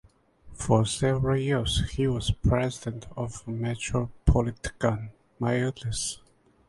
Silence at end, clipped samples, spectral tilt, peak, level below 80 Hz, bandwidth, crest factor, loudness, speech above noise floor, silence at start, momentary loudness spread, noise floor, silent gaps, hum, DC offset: 0.5 s; under 0.1%; -5.5 dB/octave; -6 dBFS; -36 dBFS; 11.5 kHz; 22 dB; -28 LUFS; 24 dB; 0.45 s; 11 LU; -51 dBFS; none; none; under 0.1%